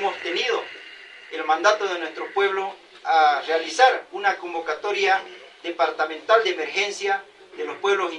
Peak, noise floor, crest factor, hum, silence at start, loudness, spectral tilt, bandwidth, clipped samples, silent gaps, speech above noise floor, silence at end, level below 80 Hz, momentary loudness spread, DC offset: -2 dBFS; -43 dBFS; 22 dB; none; 0 s; -22 LUFS; -1 dB/octave; 10.5 kHz; under 0.1%; none; 21 dB; 0 s; -76 dBFS; 16 LU; under 0.1%